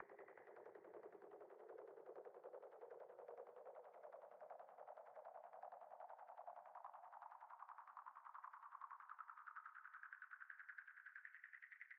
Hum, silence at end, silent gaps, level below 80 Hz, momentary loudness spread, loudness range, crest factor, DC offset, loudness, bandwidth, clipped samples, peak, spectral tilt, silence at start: none; 0 s; none; under -90 dBFS; 3 LU; 2 LU; 20 dB; under 0.1%; -60 LUFS; 3.8 kHz; under 0.1%; -40 dBFS; 5 dB/octave; 0 s